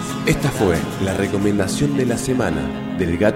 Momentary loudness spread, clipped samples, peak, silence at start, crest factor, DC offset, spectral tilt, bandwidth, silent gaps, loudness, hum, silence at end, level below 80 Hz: 4 LU; under 0.1%; -2 dBFS; 0 s; 16 dB; under 0.1%; -5.5 dB/octave; 16.5 kHz; none; -20 LUFS; none; 0 s; -38 dBFS